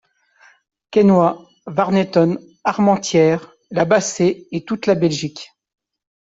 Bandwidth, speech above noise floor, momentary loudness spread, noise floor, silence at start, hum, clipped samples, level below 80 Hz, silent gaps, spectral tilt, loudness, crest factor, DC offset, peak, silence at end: 8 kHz; 37 dB; 11 LU; -53 dBFS; 0.9 s; none; under 0.1%; -58 dBFS; none; -5.5 dB/octave; -17 LUFS; 16 dB; under 0.1%; -2 dBFS; 0.95 s